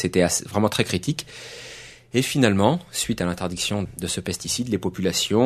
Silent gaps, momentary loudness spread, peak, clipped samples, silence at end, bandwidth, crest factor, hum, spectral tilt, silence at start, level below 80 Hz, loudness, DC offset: none; 17 LU; -2 dBFS; under 0.1%; 0 s; 13.5 kHz; 22 dB; none; -4 dB/octave; 0 s; -50 dBFS; -23 LUFS; under 0.1%